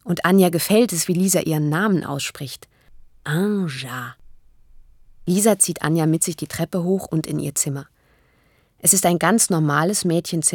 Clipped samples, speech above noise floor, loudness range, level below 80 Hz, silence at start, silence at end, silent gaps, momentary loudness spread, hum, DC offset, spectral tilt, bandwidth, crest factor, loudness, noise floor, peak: under 0.1%; 40 dB; 5 LU; -56 dBFS; 0.05 s; 0 s; none; 14 LU; none; under 0.1%; -4.5 dB/octave; 19 kHz; 20 dB; -19 LUFS; -60 dBFS; -2 dBFS